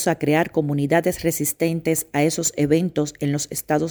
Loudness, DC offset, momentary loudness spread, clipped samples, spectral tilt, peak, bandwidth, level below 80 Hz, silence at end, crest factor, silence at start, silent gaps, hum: -21 LUFS; under 0.1%; 4 LU; under 0.1%; -5 dB/octave; -4 dBFS; over 20 kHz; -52 dBFS; 0 s; 16 dB; 0 s; none; none